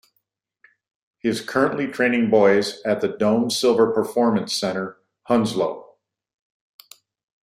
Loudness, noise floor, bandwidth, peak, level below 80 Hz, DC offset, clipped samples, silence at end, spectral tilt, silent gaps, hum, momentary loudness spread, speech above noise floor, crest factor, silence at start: -21 LUFS; -73 dBFS; 15.5 kHz; -4 dBFS; -64 dBFS; under 0.1%; under 0.1%; 1.6 s; -4.5 dB/octave; none; none; 9 LU; 53 dB; 18 dB; 1.25 s